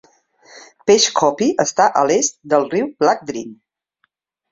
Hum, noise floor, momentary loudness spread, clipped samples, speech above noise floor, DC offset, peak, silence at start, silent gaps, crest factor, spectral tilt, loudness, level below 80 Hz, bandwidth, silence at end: none; -67 dBFS; 11 LU; under 0.1%; 51 dB; under 0.1%; -2 dBFS; 0.55 s; none; 18 dB; -2.5 dB/octave; -16 LUFS; -62 dBFS; 8 kHz; 0.95 s